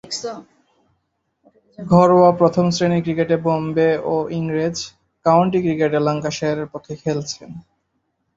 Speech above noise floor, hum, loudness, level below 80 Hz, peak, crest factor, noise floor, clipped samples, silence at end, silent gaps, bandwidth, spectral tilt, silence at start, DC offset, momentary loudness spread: 53 dB; none; -18 LUFS; -54 dBFS; -2 dBFS; 18 dB; -71 dBFS; under 0.1%; 0.75 s; none; 8 kHz; -6.5 dB/octave; 0.05 s; under 0.1%; 17 LU